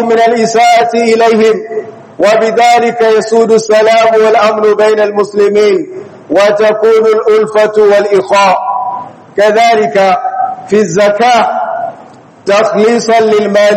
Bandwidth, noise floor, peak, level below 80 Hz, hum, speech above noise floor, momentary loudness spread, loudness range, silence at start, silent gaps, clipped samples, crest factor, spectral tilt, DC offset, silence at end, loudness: 11 kHz; -34 dBFS; 0 dBFS; -56 dBFS; none; 27 dB; 9 LU; 2 LU; 0 s; none; 2%; 8 dB; -4 dB/octave; under 0.1%; 0 s; -8 LUFS